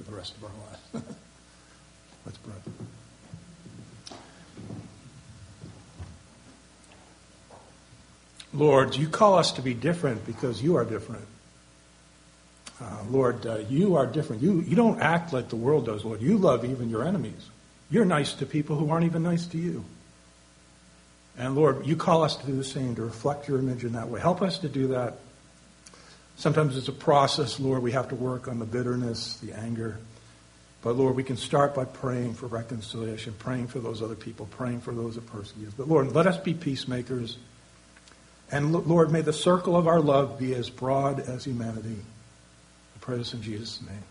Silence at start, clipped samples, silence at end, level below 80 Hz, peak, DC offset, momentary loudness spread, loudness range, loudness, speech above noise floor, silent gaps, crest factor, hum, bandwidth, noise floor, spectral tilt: 0 s; under 0.1%; 0.05 s; -58 dBFS; -6 dBFS; under 0.1%; 23 LU; 20 LU; -27 LUFS; 29 dB; none; 22 dB; none; 10.5 kHz; -56 dBFS; -6.5 dB/octave